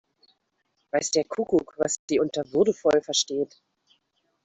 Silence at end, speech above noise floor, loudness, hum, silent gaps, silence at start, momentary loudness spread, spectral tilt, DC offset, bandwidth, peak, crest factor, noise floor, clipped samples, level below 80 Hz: 1 s; 50 dB; -25 LUFS; none; 1.99-2.08 s; 0.95 s; 6 LU; -3 dB/octave; under 0.1%; 8.4 kHz; -8 dBFS; 18 dB; -74 dBFS; under 0.1%; -64 dBFS